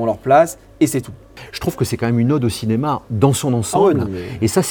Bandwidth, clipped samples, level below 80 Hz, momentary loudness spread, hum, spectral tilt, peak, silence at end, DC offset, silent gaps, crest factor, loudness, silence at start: over 20 kHz; under 0.1%; -46 dBFS; 11 LU; none; -6 dB/octave; 0 dBFS; 0 s; under 0.1%; none; 18 dB; -17 LUFS; 0 s